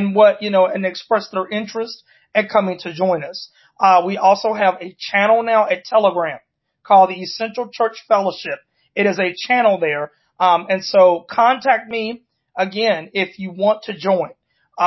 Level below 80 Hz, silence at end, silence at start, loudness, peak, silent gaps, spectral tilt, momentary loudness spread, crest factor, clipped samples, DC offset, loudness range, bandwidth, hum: -70 dBFS; 0 s; 0 s; -17 LUFS; -2 dBFS; none; -5.5 dB/octave; 14 LU; 16 dB; under 0.1%; under 0.1%; 3 LU; 6.2 kHz; none